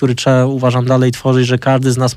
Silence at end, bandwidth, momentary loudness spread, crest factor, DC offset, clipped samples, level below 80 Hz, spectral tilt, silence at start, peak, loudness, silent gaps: 0 s; 13 kHz; 1 LU; 10 dB; under 0.1%; under 0.1%; -50 dBFS; -6.5 dB/octave; 0 s; -2 dBFS; -13 LUFS; none